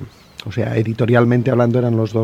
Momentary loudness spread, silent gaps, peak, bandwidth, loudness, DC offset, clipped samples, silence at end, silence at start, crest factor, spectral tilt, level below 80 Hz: 14 LU; none; 0 dBFS; 7.2 kHz; -16 LUFS; under 0.1%; under 0.1%; 0 s; 0 s; 16 dB; -8.5 dB/octave; -50 dBFS